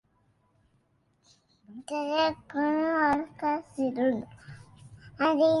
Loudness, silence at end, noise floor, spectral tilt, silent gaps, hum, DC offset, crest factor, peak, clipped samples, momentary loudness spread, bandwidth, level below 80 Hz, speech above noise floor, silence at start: -28 LUFS; 0 s; -69 dBFS; -5.5 dB/octave; none; none; under 0.1%; 18 dB; -12 dBFS; under 0.1%; 23 LU; 11.5 kHz; -64 dBFS; 42 dB; 1.7 s